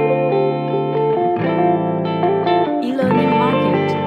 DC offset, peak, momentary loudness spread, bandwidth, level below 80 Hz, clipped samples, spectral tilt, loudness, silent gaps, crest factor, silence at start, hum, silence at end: under 0.1%; -2 dBFS; 4 LU; 8.2 kHz; -64 dBFS; under 0.1%; -8.5 dB/octave; -17 LUFS; none; 14 dB; 0 s; none; 0 s